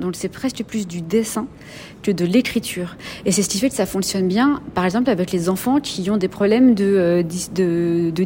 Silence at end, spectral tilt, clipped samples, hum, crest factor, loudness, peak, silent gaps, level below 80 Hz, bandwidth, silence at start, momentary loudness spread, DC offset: 0 s; -5 dB/octave; under 0.1%; none; 14 dB; -19 LUFS; -4 dBFS; none; -50 dBFS; 16.5 kHz; 0 s; 10 LU; under 0.1%